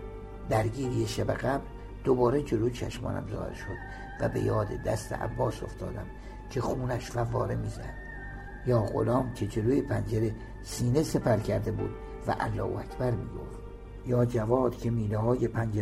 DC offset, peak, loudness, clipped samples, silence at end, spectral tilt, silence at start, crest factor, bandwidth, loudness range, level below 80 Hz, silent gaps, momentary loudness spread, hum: under 0.1%; -12 dBFS; -30 LUFS; under 0.1%; 0 s; -7 dB/octave; 0 s; 18 dB; 14.5 kHz; 4 LU; -44 dBFS; none; 14 LU; none